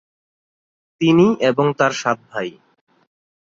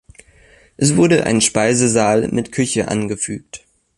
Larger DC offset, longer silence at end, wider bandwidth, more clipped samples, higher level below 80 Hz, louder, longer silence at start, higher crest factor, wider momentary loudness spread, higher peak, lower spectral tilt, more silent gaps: neither; first, 1 s vs 0.4 s; second, 7.8 kHz vs 11.5 kHz; neither; second, -60 dBFS vs -48 dBFS; about the same, -17 LUFS vs -16 LUFS; first, 1 s vs 0.8 s; about the same, 18 dB vs 16 dB; first, 14 LU vs 11 LU; about the same, -2 dBFS vs 0 dBFS; first, -6 dB/octave vs -4.5 dB/octave; neither